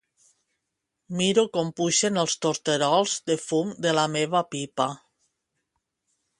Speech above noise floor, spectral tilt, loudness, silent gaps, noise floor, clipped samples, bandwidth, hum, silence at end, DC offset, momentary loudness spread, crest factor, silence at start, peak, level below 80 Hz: 57 dB; -3.5 dB/octave; -24 LUFS; none; -82 dBFS; under 0.1%; 11.5 kHz; none; 1.45 s; under 0.1%; 7 LU; 18 dB; 1.1 s; -8 dBFS; -70 dBFS